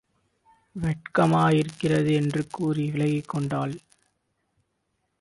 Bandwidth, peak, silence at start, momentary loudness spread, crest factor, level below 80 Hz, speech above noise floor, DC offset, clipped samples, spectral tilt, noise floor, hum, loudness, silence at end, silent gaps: 11.5 kHz; -8 dBFS; 0.75 s; 10 LU; 18 dB; -56 dBFS; 52 dB; under 0.1%; under 0.1%; -7 dB/octave; -76 dBFS; none; -25 LUFS; 1.45 s; none